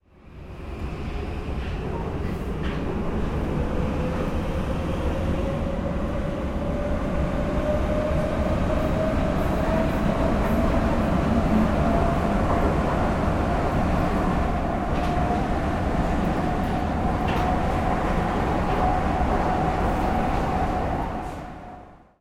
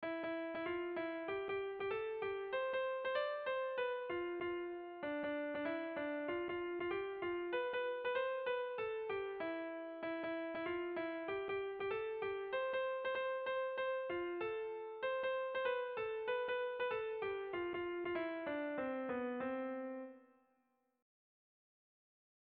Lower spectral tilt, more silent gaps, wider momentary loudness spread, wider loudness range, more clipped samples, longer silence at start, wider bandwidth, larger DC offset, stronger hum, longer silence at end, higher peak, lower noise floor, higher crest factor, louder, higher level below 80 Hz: first, -7.5 dB/octave vs -2 dB/octave; neither; first, 8 LU vs 4 LU; first, 5 LU vs 2 LU; neither; first, 0.25 s vs 0 s; first, 16 kHz vs 4.8 kHz; neither; neither; second, 0.25 s vs 2.15 s; first, -8 dBFS vs -26 dBFS; second, -44 dBFS vs -81 dBFS; about the same, 14 dB vs 14 dB; first, -25 LUFS vs -41 LUFS; first, -30 dBFS vs -76 dBFS